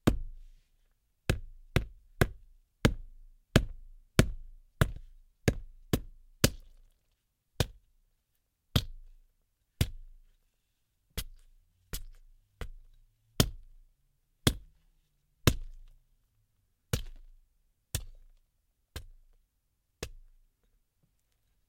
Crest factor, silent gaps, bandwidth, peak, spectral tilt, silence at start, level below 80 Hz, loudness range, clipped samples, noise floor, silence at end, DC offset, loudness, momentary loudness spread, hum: 36 dB; none; 16.5 kHz; 0 dBFS; -4.5 dB/octave; 0.05 s; -44 dBFS; 14 LU; under 0.1%; -78 dBFS; 1.5 s; under 0.1%; -33 LUFS; 19 LU; none